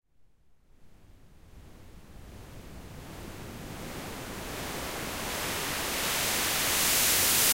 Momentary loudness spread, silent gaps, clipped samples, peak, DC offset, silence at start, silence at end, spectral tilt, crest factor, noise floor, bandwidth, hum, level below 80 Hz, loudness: 25 LU; none; under 0.1%; -12 dBFS; under 0.1%; 0.85 s; 0 s; -1 dB/octave; 22 dB; -62 dBFS; 16 kHz; none; -50 dBFS; -27 LUFS